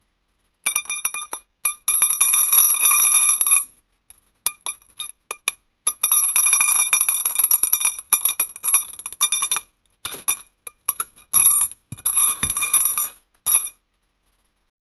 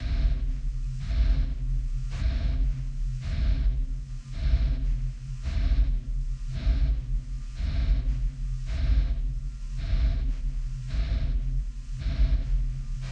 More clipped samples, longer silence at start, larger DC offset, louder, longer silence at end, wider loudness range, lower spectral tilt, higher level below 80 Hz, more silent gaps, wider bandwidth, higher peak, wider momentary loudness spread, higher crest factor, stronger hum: neither; first, 0.65 s vs 0 s; neither; first, -17 LUFS vs -31 LUFS; first, 1.3 s vs 0 s; first, 5 LU vs 1 LU; second, 2.5 dB/octave vs -7 dB/octave; second, -58 dBFS vs -26 dBFS; neither; first, 14.5 kHz vs 7 kHz; first, 0 dBFS vs -12 dBFS; first, 16 LU vs 8 LU; first, 22 dB vs 14 dB; neither